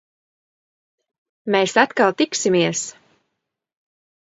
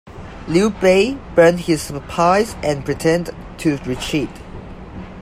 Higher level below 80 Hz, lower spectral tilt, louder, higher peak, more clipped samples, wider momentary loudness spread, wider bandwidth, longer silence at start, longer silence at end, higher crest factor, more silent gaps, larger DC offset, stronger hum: second, -70 dBFS vs -38 dBFS; second, -3.5 dB/octave vs -5.5 dB/octave; about the same, -18 LUFS vs -17 LUFS; about the same, 0 dBFS vs 0 dBFS; neither; second, 12 LU vs 21 LU; second, 8 kHz vs 15.5 kHz; first, 1.45 s vs 0.05 s; first, 1.3 s vs 0 s; about the same, 22 dB vs 18 dB; neither; neither; neither